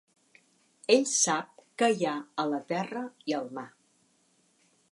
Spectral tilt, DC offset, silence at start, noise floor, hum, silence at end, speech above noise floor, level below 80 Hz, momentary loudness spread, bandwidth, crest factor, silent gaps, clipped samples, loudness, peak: -2.5 dB/octave; under 0.1%; 0.9 s; -69 dBFS; none; 1.25 s; 40 dB; -86 dBFS; 16 LU; 11.5 kHz; 22 dB; none; under 0.1%; -29 LUFS; -8 dBFS